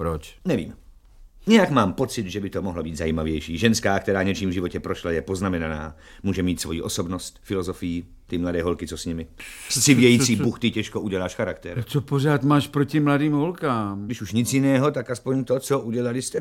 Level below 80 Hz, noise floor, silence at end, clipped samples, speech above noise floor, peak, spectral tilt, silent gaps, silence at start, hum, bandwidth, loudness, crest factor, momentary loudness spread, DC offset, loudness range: -44 dBFS; -48 dBFS; 0 s; under 0.1%; 25 dB; -2 dBFS; -5 dB/octave; none; 0 s; none; 17 kHz; -23 LUFS; 20 dB; 12 LU; under 0.1%; 6 LU